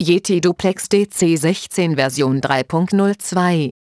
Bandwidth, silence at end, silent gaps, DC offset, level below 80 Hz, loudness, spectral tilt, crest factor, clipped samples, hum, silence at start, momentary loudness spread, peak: 11 kHz; 0.2 s; none; under 0.1%; -54 dBFS; -17 LUFS; -5 dB/octave; 16 dB; under 0.1%; none; 0 s; 3 LU; -2 dBFS